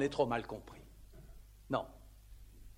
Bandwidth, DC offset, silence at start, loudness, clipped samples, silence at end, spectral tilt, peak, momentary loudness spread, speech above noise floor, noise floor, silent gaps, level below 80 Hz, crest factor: 16.5 kHz; under 0.1%; 0 s; -38 LUFS; under 0.1%; 0.05 s; -6 dB/octave; -18 dBFS; 25 LU; 19 dB; -56 dBFS; none; -56 dBFS; 22 dB